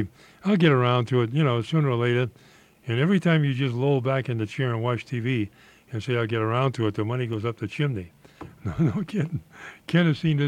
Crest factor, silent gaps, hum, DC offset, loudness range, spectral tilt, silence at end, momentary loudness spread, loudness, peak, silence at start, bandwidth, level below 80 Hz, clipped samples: 18 dB; none; none; under 0.1%; 5 LU; -8 dB/octave; 0 s; 14 LU; -25 LUFS; -6 dBFS; 0 s; 9.8 kHz; -58 dBFS; under 0.1%